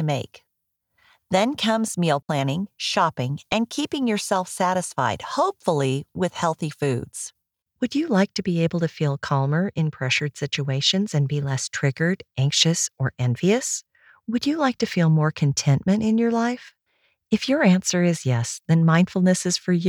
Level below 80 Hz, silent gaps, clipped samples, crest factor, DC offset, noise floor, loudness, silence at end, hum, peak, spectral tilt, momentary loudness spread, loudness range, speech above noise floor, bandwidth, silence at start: -60 dBFS; none; under 0.1%; 18 dB; under 0.1%; -77 dBFS; -22 LUFS; 0 s; none; -4 dBFS; -5 dB/octave; 8 LU; 3 LU; 55 dB; 15 kHz; 0 s